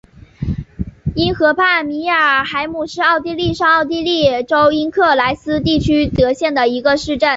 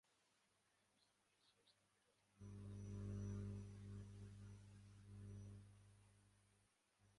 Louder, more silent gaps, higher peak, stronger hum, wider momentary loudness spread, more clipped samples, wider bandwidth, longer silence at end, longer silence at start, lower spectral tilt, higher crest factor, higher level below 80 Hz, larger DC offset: first, -15 LUFS vs -57 LUFS; neither; first, -2 dBFS vs -40 dBFS; second, none vs 50 Hz at -60 dBFS; second, 10 LU vs 14 LU; neither; second, 8 kHz vs 11 kHz; about the same, 0 s vs 0 s; second, 0.4 s vs 1.45 s; second, -5.5 dB/octave vs -7.5 dB/octave; about the same, 14 dB vs 18 dB; first, -36 dBFS vs -68 dBFS; neither